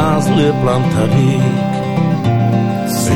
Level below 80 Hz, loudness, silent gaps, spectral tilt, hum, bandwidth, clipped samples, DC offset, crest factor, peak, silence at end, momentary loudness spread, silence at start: -40 dBFS; -14 LUFS; none; -6.5 dB/octave; none; 17.5 kHz; under 0.1%; under 0.1%; 10 dB; -2 dBFS; 0 s; 4 LU; 0 s